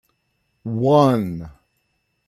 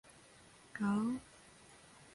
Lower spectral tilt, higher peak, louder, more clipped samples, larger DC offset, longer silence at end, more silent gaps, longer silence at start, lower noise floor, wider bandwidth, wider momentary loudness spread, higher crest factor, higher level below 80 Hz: first, -8 dB/octave vs -6.5 dB/octave; first, -2 dBFS vs -24 dBFS; first, -18 LUFS vs -38 LUFS; neither; neither; first, 0.8 s vs 0.1 s; neither; about the same, 0.65 s vs 0.75 s; first, -70 dBFS vs -62 dBFS; first, 14 kHz vs 11.5 kHz; second, 20 LU vs 24 LU; about the same, 18 dB vs 16 dB; first, -54 dBFS vs -74 dBFS